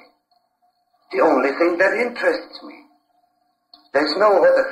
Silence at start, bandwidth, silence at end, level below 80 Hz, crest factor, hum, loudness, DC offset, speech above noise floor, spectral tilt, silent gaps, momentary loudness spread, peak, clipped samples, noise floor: 1.1 s; 11 kHz; 0 s; -66 dBFS; 16 dB; none; -18 LUFS; under 0.1%; 49 dB; -4.5 dB/octave; none; 13 LU; -6 dBFS; under 0.1%; -66 dBFS